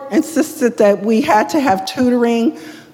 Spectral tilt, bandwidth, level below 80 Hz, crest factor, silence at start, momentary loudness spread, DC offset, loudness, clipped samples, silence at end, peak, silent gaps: -5 dB/octave; 17 kHz; -56 dBFS; 14 dB; 0 s; 5 LU; under 0.1%; -15 LUFS; under 0.1%; 0.1 s; 0 dBFS; none